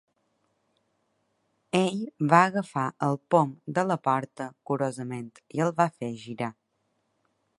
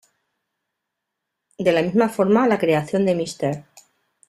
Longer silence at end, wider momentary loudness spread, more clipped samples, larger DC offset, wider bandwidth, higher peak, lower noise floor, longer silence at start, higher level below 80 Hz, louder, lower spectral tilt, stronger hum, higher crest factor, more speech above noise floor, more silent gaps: first, 1.05 s vs 0.7 s; first, 15 LU vs 9 LU; neither; neither; second, 11.5 kHz vs 13.5 kHz; about the same, -4 dBFS vs -4 dBFS; second, -75 dBFS vs -81 dBFS; first, 1.75 s vs 1.6 s; second, -74 dBFS vs -62 dBFS; second, -27 LUFS vs -20 LUFS; about the same, -6.5 dB/octave vs -6.5 dB/octave; neither; first, 26 dB vs 18 dB; second, 48 dB vs 62 dB; neither